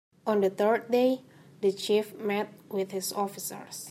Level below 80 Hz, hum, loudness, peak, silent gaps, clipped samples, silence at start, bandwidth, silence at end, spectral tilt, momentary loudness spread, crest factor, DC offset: -84 dBFS; none; -29 LUFS; -14 dBFS; none; under 0.1%; 0.25 s; 16 kHz; 0 s; -4 dB/octave; 10 LU; 16 dB; under 0.1%